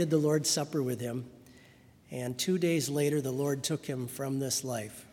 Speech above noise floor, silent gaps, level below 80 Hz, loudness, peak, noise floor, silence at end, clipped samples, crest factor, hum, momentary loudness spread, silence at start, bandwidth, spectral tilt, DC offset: 27 dB; none; -70 dBFS; -31 LUFS; -14 dBFS; -58 dBFS; 0.05 s; under 0.1%; 18 dB; none; 11 LU; 0 s; 18 kHz; -4.5 dB/octave; under 0.1%